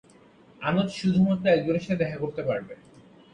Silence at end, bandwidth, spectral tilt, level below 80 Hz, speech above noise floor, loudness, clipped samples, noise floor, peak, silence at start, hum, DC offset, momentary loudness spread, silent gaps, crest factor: 0.35 s; 9.2 kHz; -7.5 dB/octave; -58 dBFS; 30 dB; -26 LUFS; under 0.1%; -55 dBFS; -10 dBFS; 0.6 s; none; under 0.1%; 10 LU; none; 18 dB